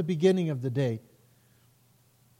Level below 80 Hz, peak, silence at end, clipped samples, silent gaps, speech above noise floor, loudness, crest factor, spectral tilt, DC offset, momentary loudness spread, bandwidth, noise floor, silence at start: -74 dBFS; -12 dBFS; 1.4 s; under 0.1%; none; 37 dB; -28 LUFS; 18 dB; -7.5 dB/octave; under 0.1%; 8 LU; 15.5 kHz; -64 dBFS; 0 s